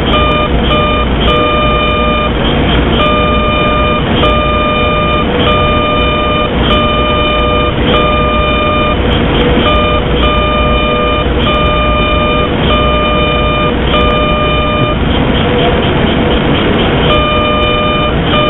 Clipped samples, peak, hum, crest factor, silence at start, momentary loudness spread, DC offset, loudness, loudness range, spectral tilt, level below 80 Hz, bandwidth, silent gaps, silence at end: under 0.1%; 0 dBFS; none; 10 dB; 0 s; 2 LU; 0.4%; -10 LUFS; 0 LU; -8.5 dB/octave; -18 dBFS; 4.1 kHz; none; 0 s